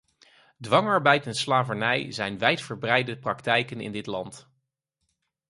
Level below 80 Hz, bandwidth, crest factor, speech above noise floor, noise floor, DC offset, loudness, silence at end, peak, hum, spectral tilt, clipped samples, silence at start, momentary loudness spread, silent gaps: -66 dBFS; 11.5 kHz; 24 dB; 54 dB; -80 dBFS; under 0.1%; -25 LUFS; 1.1 s; -4 dBFS; none; -4.5 dB/octave; under 0.1%; 0.6 s; 13 LU; none